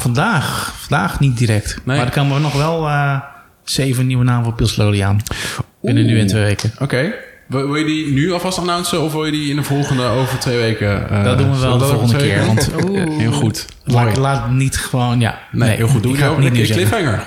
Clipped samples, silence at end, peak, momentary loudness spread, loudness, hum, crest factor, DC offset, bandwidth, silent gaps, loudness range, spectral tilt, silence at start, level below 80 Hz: under 0.1%; 0 s; 0 dBFS; 5 LU; -16 LUFS; none; 14 dB; under 0.1%; 16 kHz; none; 2 LU; -5.5 dB/octave; 0 s; -36 dBFS